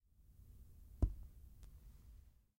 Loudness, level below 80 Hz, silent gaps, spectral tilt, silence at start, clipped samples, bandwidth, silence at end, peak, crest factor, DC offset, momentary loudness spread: -44 LUFS; -50 dBFS; none; -9 dB/octave; 0.2 s; under 0.1%; 16.5 kHz; 0.3 s; -24 dBFS; 24 dB; under 0.1%; 22 LU